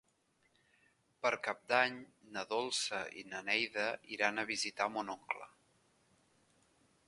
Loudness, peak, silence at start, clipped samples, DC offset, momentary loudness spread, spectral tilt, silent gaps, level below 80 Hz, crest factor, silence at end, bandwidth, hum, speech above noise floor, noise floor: -37 LUFS; -14 dBFS; 1.25 s; under 0.1%; under 0.1%; 11 LU; -1.5 dB/octave; none; -82 dBFS; 26 dB; 1.6 s; 11.5 kHz; none; 38 dB; -76 dBFS